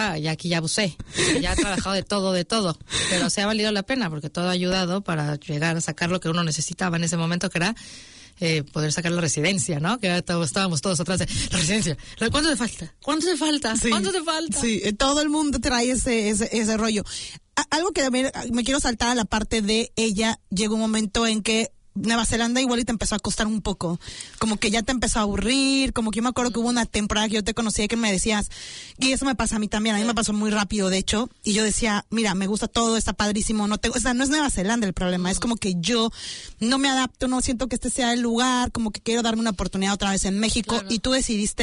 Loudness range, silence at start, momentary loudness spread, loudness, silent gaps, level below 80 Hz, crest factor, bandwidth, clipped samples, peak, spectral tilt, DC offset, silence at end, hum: 2 LU; 0 s; 5 LU; -23 LUFS; none; -40 dBFS; 14 dB; 11 kHz; under 0.1%; -10 dBFS; -3.5 dB/octave; under 0.1%; 0 s; none